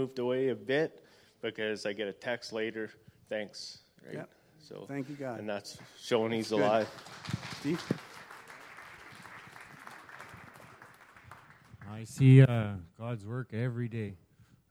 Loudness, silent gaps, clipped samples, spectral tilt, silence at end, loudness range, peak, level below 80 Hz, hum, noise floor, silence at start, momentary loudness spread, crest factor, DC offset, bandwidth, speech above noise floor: -32 LUFS; none; under 0.1%; -7 dB/octave; 0.55 s; 20 LU; -8 dBFS; -68 dBFS; none; -56 dBFS; 0 s; 21 LU; 26 dB; under 0.1%; 11.5 kHz; 25 dB